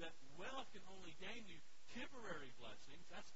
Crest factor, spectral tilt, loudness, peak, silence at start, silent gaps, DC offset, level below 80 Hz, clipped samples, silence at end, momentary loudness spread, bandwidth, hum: 18 dB; -2 dB/octave; -56 LUFS; -36 dBFS; 0 s; none; 0.4%; -74 dBFS; under 0.1%; 0 s; 8 LU; 7.6 kHz; none